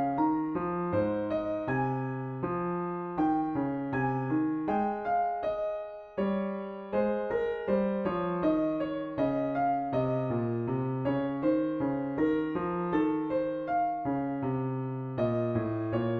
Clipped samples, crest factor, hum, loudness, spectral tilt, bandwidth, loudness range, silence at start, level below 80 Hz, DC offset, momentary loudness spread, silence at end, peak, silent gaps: under 0.1%; 14 dB; none; -31 LUFS; -10 dB/octave; 4.8 kHz; 1 LU; 0 s; -58 dBFS; under 0.1%; 5 LU; 0 s; -16 dBFS; none